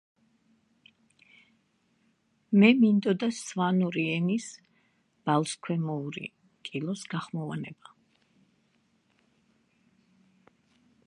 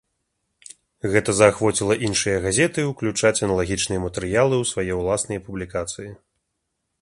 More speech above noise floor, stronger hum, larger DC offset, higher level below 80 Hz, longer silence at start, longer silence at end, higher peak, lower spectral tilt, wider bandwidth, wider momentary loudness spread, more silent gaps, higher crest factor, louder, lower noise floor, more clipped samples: second, 44 dB vs 56 dB; neither; neither; second, -78 dBFS vs -44 dBFS; first, 2.5 s vs 1.05 s; first, 3.35 s vs 0.85 s; second, -6 dBFS vs 0 dBFS; first, -6 dB/octave vs -4 dB/octave; about the same, 11.5 kHz vs 11.5 kHz; first, 17 LU vs 12 LU; neither; about the same, 24 dB vs 22 dB; second, -28 LUFS vs -21 LUFS; second, -71 dBFS vs -77 dBFS; neither